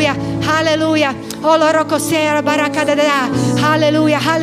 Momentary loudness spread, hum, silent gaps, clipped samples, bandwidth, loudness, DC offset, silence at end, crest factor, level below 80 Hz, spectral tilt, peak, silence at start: 3 LU; none; none; under 0.1%; 16 kHz; -14 LUFS; under 0.1%; 0 s; 14 dB; -46 dBFS; -4.5 dB/octave; 0 dBFS; 0 s